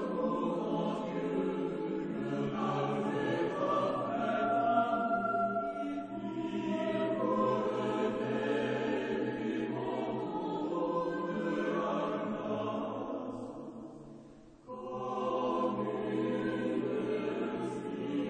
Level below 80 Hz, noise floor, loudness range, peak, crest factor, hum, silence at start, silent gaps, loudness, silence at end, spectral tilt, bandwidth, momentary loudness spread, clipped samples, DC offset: -68 dBFS; -54 dBFS; 5 LU; -18 dBFS; 16 dB; none; 0 s; none; -34 LUFS; 0 s; -7 dB/octave; 9.4 kHz; 8 LU; under 0.1%; under 0.1%